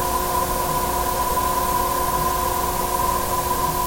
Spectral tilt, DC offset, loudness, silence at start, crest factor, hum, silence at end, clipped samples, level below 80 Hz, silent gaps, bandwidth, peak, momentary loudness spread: -3.5 dB/octave; under 0.1%; -21 LUFS; 0 s; 12 dB; none; 0 s; under 0.1%; -34 dBFS; none; 17 kHz; -8 dBFS; 1 LU